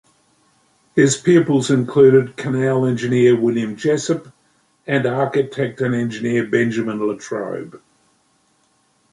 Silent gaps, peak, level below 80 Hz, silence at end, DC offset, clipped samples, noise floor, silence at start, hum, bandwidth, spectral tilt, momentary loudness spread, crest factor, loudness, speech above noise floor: none; -2 dBFS; -60 dBFS; 1.35 s; under 0.1%; under 0.1%; -61 dBFS; 0.95 s; none; 11.5 kHz; -6 dB/octave; 12 LU; 16 dB; -18 LUFS; 44 dB